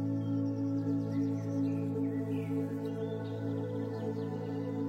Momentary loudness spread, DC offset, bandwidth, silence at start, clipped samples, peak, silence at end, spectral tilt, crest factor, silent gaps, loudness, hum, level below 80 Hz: 4 LU; under 0.1%; 8 kHz; 0 s; under 0.1%; -22 dBFS; 0 s; -9.5 dB/octave; 12 dB; none; -35 LUFS; none; -76 dBFS